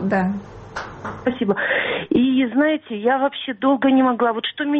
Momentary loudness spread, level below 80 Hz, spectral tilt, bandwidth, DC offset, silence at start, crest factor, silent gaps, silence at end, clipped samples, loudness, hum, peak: 15 LU; -52 dBFS; -7 dB/octave; 6.6 kHz; under 0.1%; 0 s; 12 dB; none; 0 s; under 0.1%; -19 LUFS; none; -8 dBFS